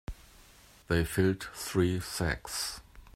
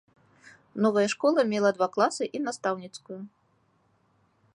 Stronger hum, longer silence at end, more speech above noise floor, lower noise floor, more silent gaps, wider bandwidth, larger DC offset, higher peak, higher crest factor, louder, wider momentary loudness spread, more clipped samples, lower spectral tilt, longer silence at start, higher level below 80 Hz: neither; second, 0.05 s vs 1.3 s; second, 27 dB vs 42 dB; second, -57 dBFS vs -68 dBFS; neither; first, 16 kHz vs 11 kHz; neither; about the same, -12 dBFS vs -10 dBFS; about the same, 20 dB vs 20 dB; second, -31 LUFS vs -26 LUFS; second, 15 LU vs 18 LU; neither; about the same, -5 dB/octave vs -4.5 dB/octave; second, 0.1 s vs 0.75 s; first, -48 dBFS vs -76 dBFS